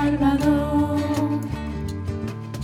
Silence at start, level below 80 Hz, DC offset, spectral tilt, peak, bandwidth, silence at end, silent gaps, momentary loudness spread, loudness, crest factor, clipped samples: 0 s; -36 dBFS; under 0.1%; -7.5 dB/octave; -8 dBFS; 14.5 kHz; 0 s; none; 10 LU; -23 LUFS; 14 dB; under 0.1%